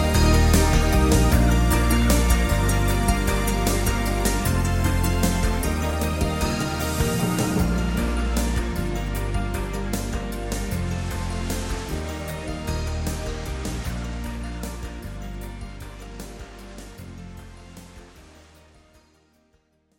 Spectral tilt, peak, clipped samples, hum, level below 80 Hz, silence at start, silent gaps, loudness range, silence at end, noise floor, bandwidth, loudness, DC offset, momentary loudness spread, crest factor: -5 dB/octave; -4 dBFS; under 0.1%; none; -26 dBFS; 0 s; none; 19 LU; 1.75 s; -64 dBFS; 17 kHz; -23 LUFS; under 0.1%; 20 LU; 18 dB